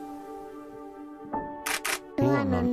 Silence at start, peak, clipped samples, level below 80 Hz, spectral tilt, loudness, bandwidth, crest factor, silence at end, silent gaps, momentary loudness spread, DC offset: 0 s; -12 dBFS; under 0.1%; -50 dBFS; -5 dB/octave; -29 LUFS; 15.5 kHz; 18 dB; 0 s; none; 18 LU; under 0.1%